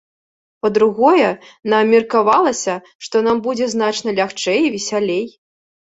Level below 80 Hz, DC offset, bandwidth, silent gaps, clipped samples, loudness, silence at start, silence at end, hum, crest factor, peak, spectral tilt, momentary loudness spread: -60 dBFS; under 0.1%; 8 kHz; 2.95-2.99 s; under 0.1%; -16 LUFS; 0.65 s; 0.65 s; none; 16 dB; -2 dBFS; -4 dB/octave; 9 LU